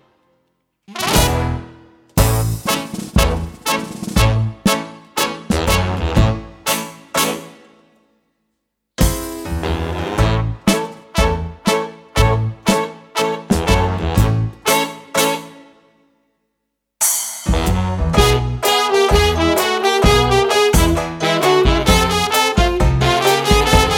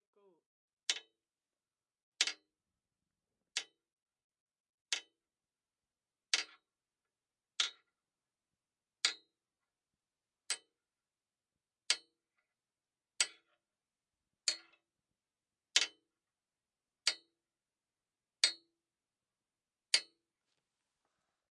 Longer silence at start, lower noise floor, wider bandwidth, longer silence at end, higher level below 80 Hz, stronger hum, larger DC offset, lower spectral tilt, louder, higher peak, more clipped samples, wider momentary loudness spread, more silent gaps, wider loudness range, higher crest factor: about the same, 0.9 s vs 0.9 s; second, -75 dBFS vs under -90 dBFS; first, 19 kHz vs 11.5 kHz; second, 0 s vs 1.45 s; first, -24 dBFS vs under -90 dBFS; neither; neither; first, -4.5 dB/octave vs 4 dB/octave; first, -17 LUFS vs -37 LUFS; first, 0 dBFS vs -10 dBFS; neither; second, 8 LU vs 13 LU; second, none vs 2.03-2.12 s, 3.93-4.06 s, 4.24-4.30 s, 4.40-4.46 s, 4.60-4.86 s; about the same, 7 LU vs 5 LU; second, 16 dB vs 36 dB